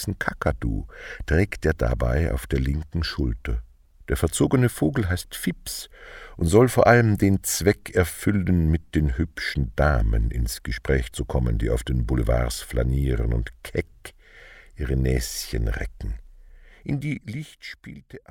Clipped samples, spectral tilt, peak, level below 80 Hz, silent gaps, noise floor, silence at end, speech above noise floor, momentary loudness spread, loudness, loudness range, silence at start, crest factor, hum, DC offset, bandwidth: under 0.1%; -6 dB/octave; -2 dBFS; -30 dBFS; none; -48 dBFS; 0.1 s; 25 dB; 16 LU; -24 LUFS; 8 LU; 0 s; 20 dB; none; under 0.1%; 18.5 kHz